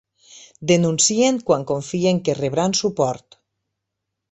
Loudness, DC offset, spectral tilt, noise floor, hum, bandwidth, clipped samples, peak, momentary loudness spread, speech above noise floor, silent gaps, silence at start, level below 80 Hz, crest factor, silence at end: -19 LUFS; under 0.1%; -4 dB/octave; -80 dBFS; none; 8.4 kHz; under 0.1%; -2 dBFS; 8 LU; 61 dB; none; 0.35 s; -58 dBFS; 18 dB; 1.15 s